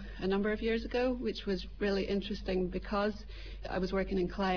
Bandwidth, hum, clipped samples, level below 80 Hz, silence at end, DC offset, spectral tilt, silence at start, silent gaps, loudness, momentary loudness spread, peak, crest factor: 5.4 kHz; none; under 0.1%; -46 dBFS; 0 s; 0.2%; -7 dB/octave; 0 s; none; -34 LUFS; 5 LU; -22 dBFS; 12 dB